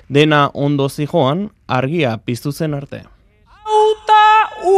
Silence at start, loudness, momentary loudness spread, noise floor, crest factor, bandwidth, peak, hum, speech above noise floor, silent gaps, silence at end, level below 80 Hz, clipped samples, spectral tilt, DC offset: 0.1 s; -15 LUFS; 12 LU; -48 dBFS; 14 dB; 15 kHz; 0 dBFS; none; 32 dB; none; 0 s; -50 dBFS; under 0.1%; -6 dB/octave; under 0.1%